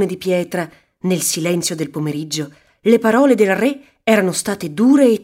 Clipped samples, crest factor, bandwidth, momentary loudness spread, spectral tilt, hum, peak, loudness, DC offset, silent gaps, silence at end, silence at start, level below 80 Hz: under 0.1%; 16 dB; 16 kHz; 12 LU; -4.5 dB/octave; none; 0 dBFS; -17 LUFS; under 0.1%; none; 0 s; 0 s; -60 dBFS